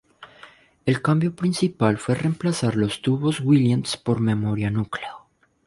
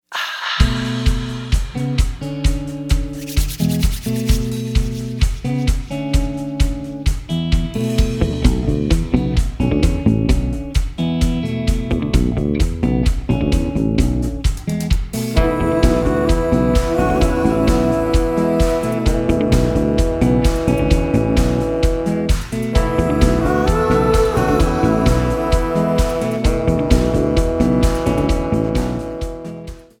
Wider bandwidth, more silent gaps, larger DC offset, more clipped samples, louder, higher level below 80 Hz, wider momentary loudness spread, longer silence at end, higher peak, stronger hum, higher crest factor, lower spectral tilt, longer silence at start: second, 11.5 kHz vs 18 kHz; neither; neither; neither; second, -22 LUFS vs -18 LUFS; second, -54 dBFS vs -20 dBFS; about the same, 7 LU vs 6 LU; first, 0.5 s vs 0.2 s; second, -4 dBFS vs 0 dBFS; neither; about the same, 18 dB vs 16 dB; about the same, -6.5 dB/octave vs -6.5 dB/octave; about the same, 0.2 s vs 0.1 s